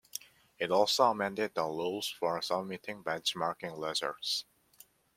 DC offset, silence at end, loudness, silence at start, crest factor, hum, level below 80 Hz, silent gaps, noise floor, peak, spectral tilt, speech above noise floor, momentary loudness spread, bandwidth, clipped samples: under 0.1%; 0.75 s; -33 LUFS; 0.15 s; 22 dB; none; -76 dBFS; none; -62 dBFS; -12 dBFS; -3 dB/octave; 29 dB; 11 LU; 16.5 kHz; under 0.1%